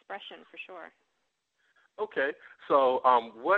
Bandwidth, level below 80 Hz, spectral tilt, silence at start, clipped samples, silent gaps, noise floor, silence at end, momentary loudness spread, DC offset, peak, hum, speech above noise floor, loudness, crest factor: 4.8 kHz; -78 dBFS; -6 dB/octave; 0.1 s; under 0.1%; none; -79 dBFS; 0 s; 21 LU; under 0.1%; -10 dBFS; none; 51 dB; -27 LUFS; 20 dB